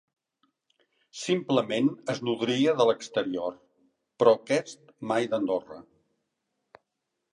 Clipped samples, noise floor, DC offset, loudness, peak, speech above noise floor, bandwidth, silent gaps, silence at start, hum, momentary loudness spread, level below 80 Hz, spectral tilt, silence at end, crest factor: under 0.1%; -83 dBFS; under 0.1%; -27 LUFS; -6 dBFS; 56 dB; 11 kHz; none; 1.15 s; none; 16 LU; -76 dBFS; -5 dB/octave; 1.5 s; 22 dB